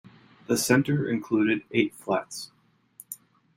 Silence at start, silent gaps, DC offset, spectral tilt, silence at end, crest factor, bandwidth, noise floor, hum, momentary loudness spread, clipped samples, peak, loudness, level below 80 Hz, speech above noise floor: 0.5 s; none; under 0.1%; -5 dB/octave; 0.4 s; 20 dB; 16 kHz; -54 dBFS; none; 19 LU; under 0.1%; -8 dBFS; -25 LUFS; -66 dBFS; 29 dB